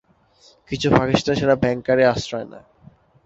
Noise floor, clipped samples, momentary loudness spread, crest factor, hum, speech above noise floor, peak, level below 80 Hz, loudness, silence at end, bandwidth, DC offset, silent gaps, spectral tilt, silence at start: -55 dBFS; under 0.1%; 14 LU; 18 dB; none; 36 dB; -2 dBFS; -46 dBFS; -19 LUFS; 0.65 s; 8 kHz; under 0.1%; none; -6 dB/octave; 0.7 s